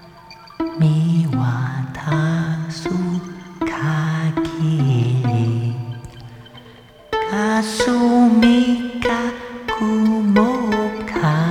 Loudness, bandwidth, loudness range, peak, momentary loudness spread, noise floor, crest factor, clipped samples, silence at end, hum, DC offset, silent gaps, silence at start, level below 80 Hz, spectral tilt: -19 LUFS; 12 kHz; 5 LU; -2 dBFS; 12 LU; -43 dBFS; 16 dB; under 0.1%; 0 s; none; under 0.1%; none; 0 s; -46 dBFS; -7 dB/octave